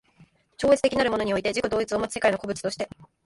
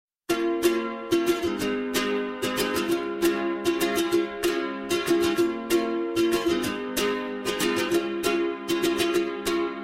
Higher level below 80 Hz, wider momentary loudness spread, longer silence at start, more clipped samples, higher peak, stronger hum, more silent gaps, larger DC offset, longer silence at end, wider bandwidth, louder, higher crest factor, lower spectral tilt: about the same, -52 dBFS vs -54 dBFS; first, 10 LU vs 4 LU; first, 0.6 s vs 0.3 s; neither; first, -6 dBFS vs -10 dBFS; neither; neither; neither; first, 0.2 s vs 0 s; second, 11.5 kHz vs 16 kHz; about the same, -25 LUFS vs -25 LUFS; about the same, 20 dB vs 16 dB; about the same, -4 dB/octave vs -3.5 dB/octave